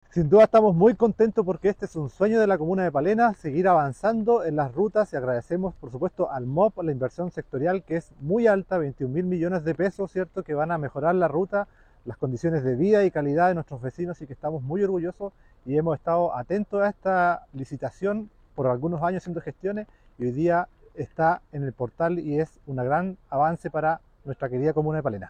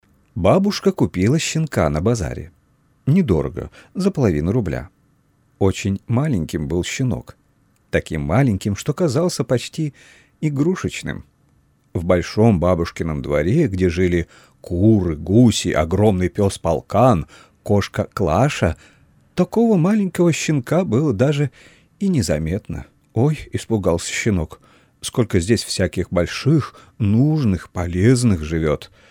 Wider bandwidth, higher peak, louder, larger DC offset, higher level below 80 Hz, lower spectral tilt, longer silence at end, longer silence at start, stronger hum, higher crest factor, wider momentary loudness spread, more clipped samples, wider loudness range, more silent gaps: second, 9.4 kHz vs 16.5 kHz; second, -8 dBFS vs -2 dBFS; second, -25 LUFS vs -19 LUFS; neither; second, -54 dBFS vs -38 dBFS; first, -9 dB/octave vs -6.5 dB/octave; second, 0 s vs 0.25 s; second, 0.15 s vs 0.35 s; neither; about the same, 18 dB vs 16 dB; about the same, 12 LU vs 11 LU; neither; about the same, 5 LU vs 4 LU; neither